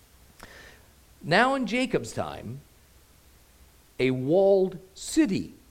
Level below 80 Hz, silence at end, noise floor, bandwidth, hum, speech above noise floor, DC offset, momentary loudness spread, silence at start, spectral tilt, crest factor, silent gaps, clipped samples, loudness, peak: -56 dBFS; 0.2 s; -57 dBFS; 16 kHz; none; 31 dB; under 0.1%; 21 LU; 0.4 s; -5 dB/octave; 20 dB; none; under 0.1%; -25 LUFS; -8 dBFS